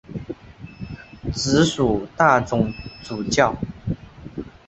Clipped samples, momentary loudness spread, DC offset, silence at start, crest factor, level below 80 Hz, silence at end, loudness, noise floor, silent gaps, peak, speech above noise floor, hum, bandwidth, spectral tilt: under 0.1%; 19 LU; under 0.1%; 0.1 s; 20 dB; -42 dBFS; 0.2 s; -21 LUFS; -40 dBFS; none; -2 dBFS; 20 dB; none; 8.4 kHz; -5 dB/octave